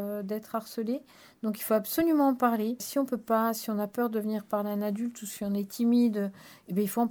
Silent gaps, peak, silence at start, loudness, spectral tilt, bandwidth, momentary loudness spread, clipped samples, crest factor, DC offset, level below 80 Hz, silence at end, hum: none; -12 dBFS; 0 s; -29 LUFS; -5.5 dB/octave; over 20 kHz; 10 LU; under 0.1%; 18 dB; under 0.1%; -70 dBFS; 0 s; none